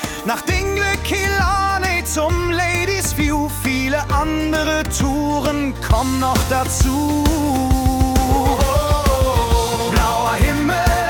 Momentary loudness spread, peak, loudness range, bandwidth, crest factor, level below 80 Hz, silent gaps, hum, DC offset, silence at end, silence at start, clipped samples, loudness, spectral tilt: 3 LU; -4 dBFS; 2 LU; 18 kHz; 14 dB; -24 dBFS; none; none; under 0.1%; 0 s; 0 s; under 0.1%; -18 LUFS; -4.5 dB/octave